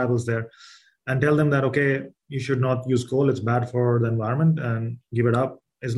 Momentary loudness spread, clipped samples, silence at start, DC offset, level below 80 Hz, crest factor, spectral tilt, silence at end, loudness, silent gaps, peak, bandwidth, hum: 9 LU; under 0.1%; 0 s; under 0.1%; -60 dBFS; 16 dB; -8 dB/octave; 0 s; -23 LUFS; none; -6 dBFS; 11.5 kHz; none